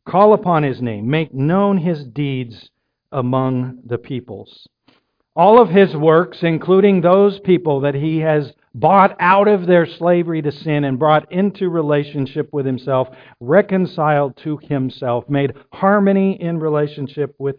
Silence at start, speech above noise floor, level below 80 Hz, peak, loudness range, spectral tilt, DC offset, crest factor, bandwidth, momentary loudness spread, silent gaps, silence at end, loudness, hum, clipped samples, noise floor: 0.05 s; 43 dB; -58 dBFS; 0 dBFS; 6 LU; -10.5 dB/octave; under 0.1%; 16 dB; 5.2 kHz; 12 LU; none; 0 s; -16 LUFS; none; under 0.1%; -58 dBFS